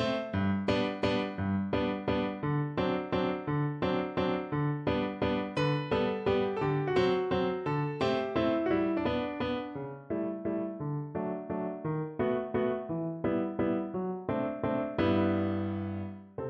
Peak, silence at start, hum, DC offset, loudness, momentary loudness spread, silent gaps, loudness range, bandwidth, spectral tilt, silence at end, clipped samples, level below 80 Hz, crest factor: -14 dBFS; 0 s; none; under 0.1%; -32 LUFS; 6 LU; none; 4 LU; 8.8 kHz; -8 dB/octave; 0 s; under 0.1%; -56 dBFS; 16 dB